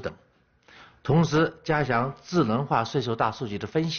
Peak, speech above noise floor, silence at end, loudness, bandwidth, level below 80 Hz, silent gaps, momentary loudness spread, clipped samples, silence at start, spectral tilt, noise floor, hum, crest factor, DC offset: -8 dBFS; 38 dB; 0 s; -25 LUFS; 6.8 kHz; -54 dBFS; none; 7 LU; under 0.1%; 0 s; -5.5 dB/octave; -63 dBFS; none; 18 dB; under 0.1%